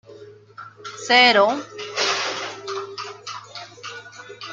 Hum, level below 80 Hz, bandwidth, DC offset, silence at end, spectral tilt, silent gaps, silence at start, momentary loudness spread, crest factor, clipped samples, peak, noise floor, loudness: none; -76 dBFS; 9.4 kHz; under 0.1%; 0 s; -1.5 dB/octave; none; 0.1 s; 24 LU; 22 dB; under 0.1%; -2 dBFS; -44 dBFS; -19 LUFS